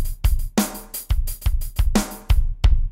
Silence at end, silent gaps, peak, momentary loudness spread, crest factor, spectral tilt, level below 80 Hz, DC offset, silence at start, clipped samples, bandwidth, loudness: 0 s; none; -6 dBFS; 5 LU; 14 dB; -5 dB/octave; -20 dBFS; under 0.1%; 0 s; under 0.1%; 16.5 kHz; -24 LUFS